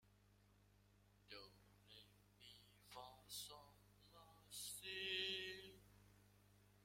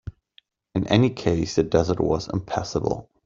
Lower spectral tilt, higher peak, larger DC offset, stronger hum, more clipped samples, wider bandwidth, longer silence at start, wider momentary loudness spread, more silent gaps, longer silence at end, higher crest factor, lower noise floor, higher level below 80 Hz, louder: second, -1.5 dB/octave vs -6.5 dB/octave; second, -32 dBFS vs -4 dBFS; neither; first, 50 Hz at -75 dBFS vs none; neither; first, 16.5 kHz vs 7.6 kHz; about the same, 0.05 s vs 0.05 s; first, 23 LU vs 9 LU; neither; second, 0 s vs 0.25 s; first, 26 dB vs 20 dB; first, -74 dBFS vs -60 dBFS; second, -80 dBFS vs -46 dBFS; second, -50 LUFS vs -23 LUFS